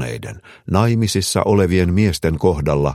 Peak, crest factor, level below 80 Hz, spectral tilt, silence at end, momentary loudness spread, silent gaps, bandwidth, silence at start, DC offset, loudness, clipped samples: 0 dBFS; 16 dB; -34 dBFS; -6 dB/octave; 0 s; 13 LU; none; 15 kHz; 0 s; under 0.1%; -17 LUFS; under 0.1%